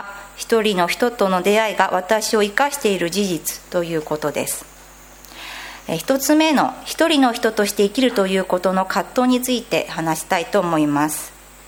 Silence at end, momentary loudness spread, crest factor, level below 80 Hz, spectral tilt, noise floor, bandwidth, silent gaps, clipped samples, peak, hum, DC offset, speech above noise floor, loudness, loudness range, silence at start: 0.05 s; 11 LU; 20 dB; -52 dBFS; -4 dB/octave; -43 dBFS; 17.5 kHz; none; under 0.1%; 0 dBFS; none; under 0.1%; 24 dB; -19 LUFS; 5 LU; 0 s